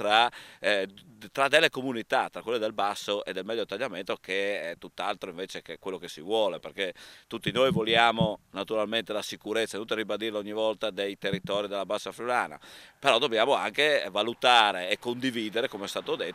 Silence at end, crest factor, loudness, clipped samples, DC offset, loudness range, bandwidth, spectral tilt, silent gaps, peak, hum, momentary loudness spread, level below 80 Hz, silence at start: 0 s; 22 dB; -28 LUFS; under 0.1%; under 0.1%; 7 LU; 16 kHz; -3.5 dB/octave; none; -6 dBFS; none; 14 LU; -66 dBFS; 0 s